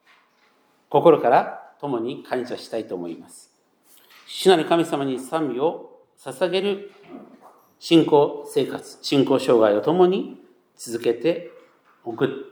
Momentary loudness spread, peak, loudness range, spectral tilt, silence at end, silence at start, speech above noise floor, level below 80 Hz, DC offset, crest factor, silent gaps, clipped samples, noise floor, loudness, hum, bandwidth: 19 LU; -2 dBFS; 5 LU; -5.5 dB/octave; 0.05 s; 0.9 s; 40 dB; -80 dBFS; under 0.1%; 20 dB; none; under 0.1%; -61 dBFS; -21 LUFS; none; 20 kHz